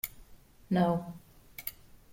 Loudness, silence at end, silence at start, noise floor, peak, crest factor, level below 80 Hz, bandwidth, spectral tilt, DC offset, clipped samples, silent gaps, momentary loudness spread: -33 LUFS; 0.4 s; 0.05 s; -55 dBFS; -16 dBFS; 20 dB; -60 dBFS; 16.5 kHz; -7 dB/octave; under 0.1%; under 0.1%; none; 20 LU